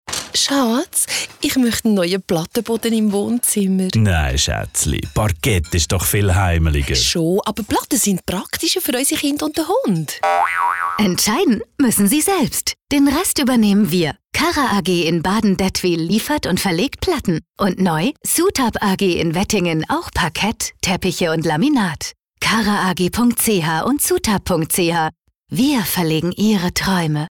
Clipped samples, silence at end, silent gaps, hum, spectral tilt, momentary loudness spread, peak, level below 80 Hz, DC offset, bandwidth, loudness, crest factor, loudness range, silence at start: under 0.1%; 0 s; none; none; -4 dB/octave; 5 LU; -6 dBFS; -36 dBFS; under 0.1%; 19.5 kHz; -17 LUFS; 12 dB; 2 LU; 0.05 s